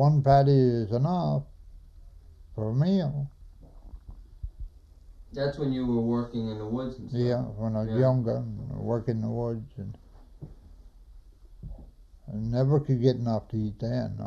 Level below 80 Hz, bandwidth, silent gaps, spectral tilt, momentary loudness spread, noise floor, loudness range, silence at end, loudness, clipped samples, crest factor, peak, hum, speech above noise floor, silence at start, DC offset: -48 dBFS; 6.6 kHz; none; -9.5 dB/octave; 23 LU; -51 dBFS; 7 LU; 0 s; -27 LUFS; under 0.1%; 20 dB; -8 dBFS; none; 25 dB; 0 s; under 0.1%